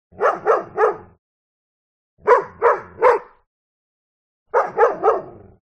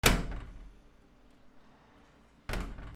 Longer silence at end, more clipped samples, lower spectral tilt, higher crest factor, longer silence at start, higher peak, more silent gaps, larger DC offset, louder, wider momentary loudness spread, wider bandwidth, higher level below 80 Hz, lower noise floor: first, 0.35 s vs 0 s; neither; first, -5.5 dB/octave vs -3.5 dB/octave; second, 18 dB vs 30 dB; first, 0.2 s vs 0.05 s; first, -2 dBFS vs -6 dBFS; first, 1.19-2.17 s, 3.47-4.46 s vs none; neither; first, -19 LUFS vs -35 LUFS; second, 7 LU vs 23 LU; second, 8.4 kHz vs 16 kHz; second, -60 dBFS vs -40 dBFS; first, under -90 dBFS vs -61 dBFS